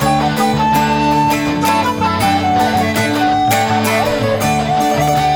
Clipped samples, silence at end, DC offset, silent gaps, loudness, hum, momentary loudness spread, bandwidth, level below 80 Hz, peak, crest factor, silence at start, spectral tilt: under 0.1%; 0 s; under 0.1%; none; -14 LUFS; none; 2 LU; 19 kHz; -36 dBFS; -2 dBFS; 12 dB; 0 s; -5 dB/octave